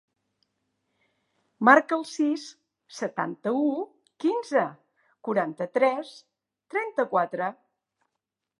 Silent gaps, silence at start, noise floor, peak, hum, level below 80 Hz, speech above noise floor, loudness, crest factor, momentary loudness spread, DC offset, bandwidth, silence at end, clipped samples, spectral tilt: none; 1.6 s; -85 dBFS; -2 dBFS; none; -86 dBFS; 60 dB; -26 LUFS; 26 dB; 15 LU; under 0.1%; 11.5 kHz; 1.05 s; under 0.1%; -5 dB/octave